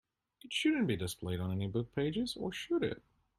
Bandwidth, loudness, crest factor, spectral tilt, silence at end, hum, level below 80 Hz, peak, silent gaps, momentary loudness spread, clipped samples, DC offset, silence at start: 14 kHz; -36 LUFS; 16 dB; -5.5 dB/octave; 0.4 s; none; -62 dBFS; -20 dBFS; none; 7 LU; under 0.1%; under 0.1%; 0.45 s